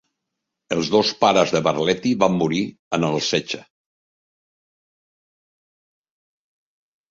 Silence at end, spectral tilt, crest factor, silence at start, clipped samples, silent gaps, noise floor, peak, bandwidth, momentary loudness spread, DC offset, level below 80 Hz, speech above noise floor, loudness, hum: 3.5 s; -4.5 dB/octave; 22 dB; 0.7 s; under 0.1%; 2.79-2.91 s; -81 dBFS; -2 dBFS; 7.8 kHz; 8 LU; under 0.1%; -60 dBFS; 61 dB; -20 LUFS; none